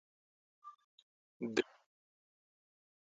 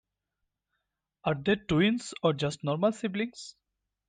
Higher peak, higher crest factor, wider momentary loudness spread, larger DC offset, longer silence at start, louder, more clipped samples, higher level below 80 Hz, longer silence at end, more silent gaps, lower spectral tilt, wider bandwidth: second, -18 dBFS vs -12 dBFS; first, 28 dB vs 18 dB; first, 21 LU vs 10 LU; neither; second, 0.65 s vs 1.25 s; second, -40 LUFS vs -29 LUFS; neither; second, -82 dBFS vs -60 dBFS; first, 1.5 s vs 0.6 s; first, 0.84-1.40 s vs none; second, -3 dB/octave vs -6 dB/octave; second, 7.2 kHz vs 9.6 kHz